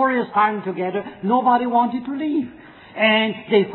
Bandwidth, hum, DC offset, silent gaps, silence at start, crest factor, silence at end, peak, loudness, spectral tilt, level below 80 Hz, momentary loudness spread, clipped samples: 4.2 kHz; none; under 0.1%; none; 0 s; 16 dB; 0 s; -2 dBFS; -20 LUFS; -9 dB/octave; -64 dBFS; 9 LU; under 0.1%